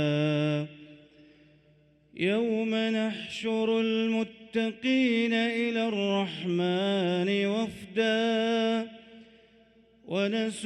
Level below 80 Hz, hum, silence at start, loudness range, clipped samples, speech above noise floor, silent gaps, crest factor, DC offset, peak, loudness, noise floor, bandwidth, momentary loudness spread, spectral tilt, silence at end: -70 dBFS; none; 0 s; 3 LU; under 0.1%; 35 dB; none; 14 dB; under 0.1%; -14 dBFS; -28 LUFS; -62 dBFS; 11 kHz; 7 LU; -6 dB/octave; 0 s